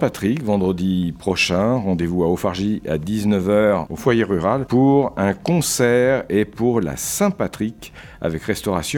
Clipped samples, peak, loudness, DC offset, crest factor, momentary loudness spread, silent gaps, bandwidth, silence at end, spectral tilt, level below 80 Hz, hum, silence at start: under 0.1%; -2 dBFS; -19 LUFS; under 0.1%; 16 dB; 7 LU; none; 19.5 kHz; 0 s; -5.5 dB/octave; -44 dBFS; none; 0 s